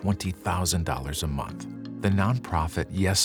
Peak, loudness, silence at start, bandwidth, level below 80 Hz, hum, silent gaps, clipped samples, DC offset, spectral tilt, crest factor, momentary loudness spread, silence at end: -8 dBFS; -28 LUFS; 0 s; 20 kHz; -42 dBFS; none; none; under 0.1%; under 0.1%; -4.5 dB/octave; 18 dB; 9 LU; 0 s